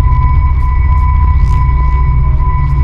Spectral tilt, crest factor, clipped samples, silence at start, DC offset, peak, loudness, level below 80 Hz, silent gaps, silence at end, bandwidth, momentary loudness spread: -9.5 dB/octave; 8 dB; 0.3%; 0 s; under 0.1%; 0 dBFS; -12 LUFS; -10 dBFS; none; 0 s; 3.1 kHz; 2 LU